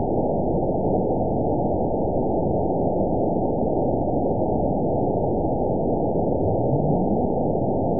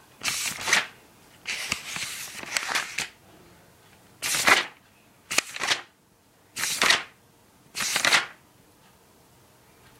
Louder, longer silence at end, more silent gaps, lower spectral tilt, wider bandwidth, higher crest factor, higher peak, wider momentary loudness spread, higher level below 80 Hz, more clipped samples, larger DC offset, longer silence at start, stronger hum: about the same, -23 LUFS vs -25 LUFS; second, 0 s vs 1.65 s; neither; first, -19 dB/octave vs 0.5 dB/octave; second, 1 kHz vs 16 kHz; second, 12 dB vs 26 dB; second, -10 dBFS vs -2 dBFS; second, 1 LU vs 16 LU; first, -36 dBFS vs -66 dBFS; neither; first, 2% vs under 0.1%; second, 0 s vs 0.2 s; neither